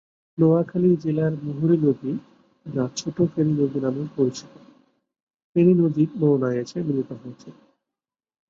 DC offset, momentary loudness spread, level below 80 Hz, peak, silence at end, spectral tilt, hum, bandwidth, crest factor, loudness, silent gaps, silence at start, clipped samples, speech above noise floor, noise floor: under 0.1%; 12 LU; -64 dBFS; -6 dBFS; 1 s; -8 dB/octave; none; 7.6 kHz; 18 dB; -22 LUFS; 5.22-5.27 s, 5.44-5.55 s; 0.4 s; under 0.1%; 67 dB; -89 dBFS